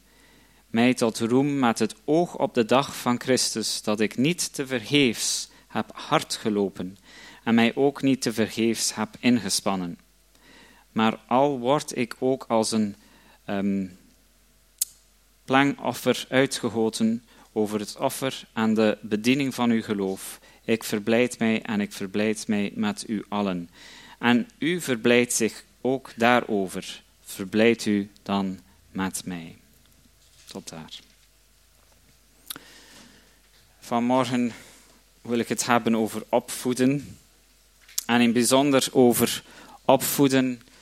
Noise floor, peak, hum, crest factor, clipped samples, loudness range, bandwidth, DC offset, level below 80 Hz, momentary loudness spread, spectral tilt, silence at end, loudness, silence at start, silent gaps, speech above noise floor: -60 dBFS; -2 dBFS; none; 24 dB; under 0.1%; 7 LU; 16.5 kHz; under 0.1%; -64 dBFS; 15 LU; -4 dB/octave; 0.25 s; -24 LUFS; 0.75 s; none; 36 dB